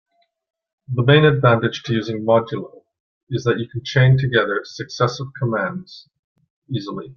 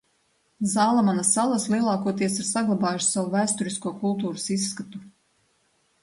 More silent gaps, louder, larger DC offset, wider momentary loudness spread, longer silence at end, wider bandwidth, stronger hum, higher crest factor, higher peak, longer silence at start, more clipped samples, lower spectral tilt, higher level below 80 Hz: first, 3.00-3.27 s, 6.19-6.35 s, 6.50-6.62 s vs none; first, -19 LUFS vs -24 LUFS; neither; first, 15 LU vs 9 LU; second, 0.05 s vs 0.95 s; second, 6.8 kHz vs 11.5 kHz; neither; about the same, 20 dB vs 16 dB; first, 0 dBFS vs -8 dBFS; first, 0.9 s vs 0.6 s; neither; first, -7 dB/octave vs -4 dB/octave; first, -54 dBFS vs -68 dBFS